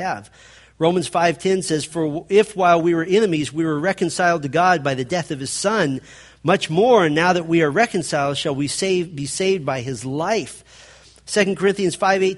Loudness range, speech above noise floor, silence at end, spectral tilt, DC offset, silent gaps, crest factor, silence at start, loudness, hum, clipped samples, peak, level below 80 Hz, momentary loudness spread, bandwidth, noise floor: 4 LU; 28 dB; 0 s; -4.5 dB/octave; under 0.1%; none; 18 dB; 0 s; -19 LUFS; none; under 0.1%; -2 dBFS; -56 dBFS; 8 LU; 11.5 kHz; -47 dBFS